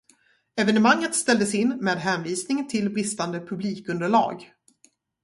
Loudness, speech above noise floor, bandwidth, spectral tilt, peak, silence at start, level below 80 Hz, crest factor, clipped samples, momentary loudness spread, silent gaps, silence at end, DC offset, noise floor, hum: -24 LUFS; 39 dB; 11.5 kHz; -4 dB/octave; -6 dBFS; 0.55 s; -68 dBFS; 20 dB; under 0.1%; 10 LU; none; 0.8 s; under 0.1%; -62 dBFS; none